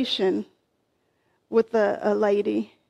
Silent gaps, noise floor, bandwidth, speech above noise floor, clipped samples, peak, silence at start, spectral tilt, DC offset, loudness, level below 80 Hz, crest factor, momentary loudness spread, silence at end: none; -71 dBFS; 11 kHz; 48 dB; under 0.1%; -8 dBFS; 0 s; -5.5 dB/octave; under 0.1%; -24 LUFS; -70 dBFS; 16 dB; 7 LU; 0.25 s